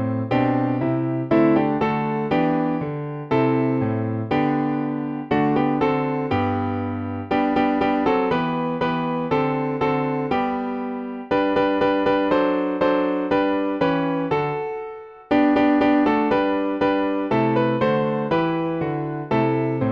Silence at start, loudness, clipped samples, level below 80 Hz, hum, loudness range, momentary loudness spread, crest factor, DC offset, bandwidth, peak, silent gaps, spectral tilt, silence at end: 0 s; -21 LUFS; under 0.1%; -52 dBFS; none; 2 LU; 7 LU; 14 dB; under 0.1%; 6.2 kHz; -6 dBFS; none; -9 dB/octave; 0 s